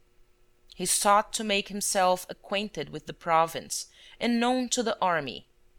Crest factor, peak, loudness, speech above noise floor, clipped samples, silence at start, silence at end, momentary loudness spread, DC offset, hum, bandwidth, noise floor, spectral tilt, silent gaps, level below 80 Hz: 20 dB; -10 dBFS; -27 LUFS; 32 dB; under 0.1%; 0.8 s; 0.4 s; 13 LU; under 0.1%; none; 19 kHz; -60 dBFS; -2.5 dB/octave; none; -58 dBFS